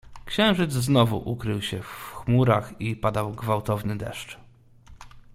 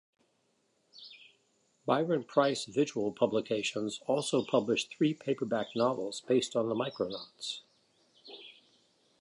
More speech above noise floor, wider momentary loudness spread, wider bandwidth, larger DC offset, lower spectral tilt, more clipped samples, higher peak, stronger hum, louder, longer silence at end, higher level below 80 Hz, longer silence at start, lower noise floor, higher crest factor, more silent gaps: second, 25 dB vs 43 dB; second, 14 LU vs 20 LU; first, 16 kHz vs 11.5 kHz; neither; first, -6 dB/octave vs -4.5 dB/octave; neither; first, -4 dBFS vs -14 dBFS; neither; first, -25 LUFS vs -32 LUFS; second, 0.15 s vs 0.7 s; first, -48 dBFS vs -78 dBFS; second, 0.05 s vs 0.95 s; second, -50 dBFS vs -75 dBFS; about the same, 20 dB vs 20 dB; neither